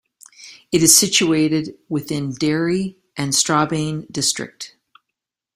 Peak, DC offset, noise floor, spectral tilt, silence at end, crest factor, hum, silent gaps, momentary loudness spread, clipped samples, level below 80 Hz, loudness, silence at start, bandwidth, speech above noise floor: 0 dBFS; under 0.1%; -82 dBFS; -3 dB/octave; 0.85 s; 20 dB; none; none; 16 LU; under 0.1%; -56 dBFS; -18 LUFS; 0.4 s; 16 kHz; 64 dB